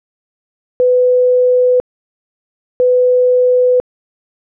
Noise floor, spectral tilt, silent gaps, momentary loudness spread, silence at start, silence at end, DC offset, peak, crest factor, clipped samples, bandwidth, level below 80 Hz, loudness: under -90 dBFS; -8.5 dB/octave; 1.80-2.80 s; 6 LU; 0.8 s; 0.75 s; under 0.1%; -8 dBFS; 6 dB; under 0.1%; 1.4 kHz; -58 dBFS; -12 LUFS